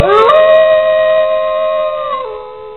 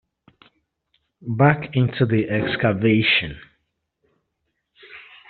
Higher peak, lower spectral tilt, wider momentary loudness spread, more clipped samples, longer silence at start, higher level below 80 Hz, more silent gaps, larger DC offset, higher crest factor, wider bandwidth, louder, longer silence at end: first, 0 dBFS vs -4 dBFS; about the same, -5 dB/octave vs -4.5 dB/octave; second, 13 LU vs 22 LU; neither; second, 0 s vs 1.25 s; first, -48 dBFS vs -54 dBFS; neither; first, 0.7% vs under 0.1%; second, 10 dB vs 20 dB; about the same, 4.3 kHz vs 4.6 kHz; first, -10 LUFS vs -19 LUFS; second, 0 s vs 0.3 s